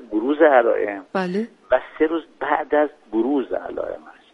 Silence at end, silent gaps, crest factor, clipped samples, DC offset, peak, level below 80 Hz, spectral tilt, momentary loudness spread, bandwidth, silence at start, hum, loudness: 0.2 s; none; 18 dB; under 0.1%; under 0.1%; -2 dBFS; -58 dBFS; -7.5 dB/octave; 13 LU; 6.2 kHz; 0 s; none; -21 LUFS